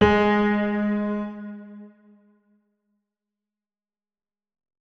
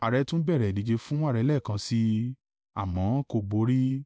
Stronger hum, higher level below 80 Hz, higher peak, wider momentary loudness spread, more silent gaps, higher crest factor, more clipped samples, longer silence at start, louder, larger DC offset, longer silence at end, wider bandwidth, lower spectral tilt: neither; about the same, -48 dBFS vs -48 dBFS; first, -4 dBFS vs -14 dBFS; first, 23 LU vs 8 LU; neither; first, 24 dB vs 12 dB; neither; about the same, 0 s vs 0 s; first, -23 LUFS vs -28 LUFS; neither; first, 2.95 s vs 0 s; second, 6.4 kHz vs 8 kHz; about the same, -7.5 dB/octave vs -7.5 dB/octave